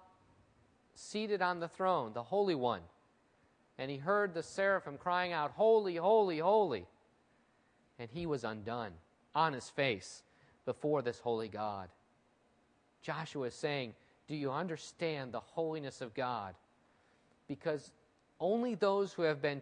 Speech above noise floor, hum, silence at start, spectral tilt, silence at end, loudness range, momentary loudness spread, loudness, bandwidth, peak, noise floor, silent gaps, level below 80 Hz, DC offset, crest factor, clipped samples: 37 dB; none; 0.95 s; -5.5 dB/octave; 0 s; 9 LU; 13 LU; -36 LUFS; 10 kHz; -18 dBFS; -72 dBFS; none; -76 dBFS; under 0.1%; 20 dB; under 0.1%